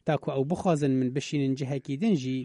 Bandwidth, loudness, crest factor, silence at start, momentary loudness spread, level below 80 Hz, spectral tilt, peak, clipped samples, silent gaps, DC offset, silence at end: 11 kHz; -28 LUFS; 14 dB; 0.05 s; 4 LU; -62 dBFS; -7 dB/octave; -12 dBFS; under 0.1%; none; under 0.1%; 0 s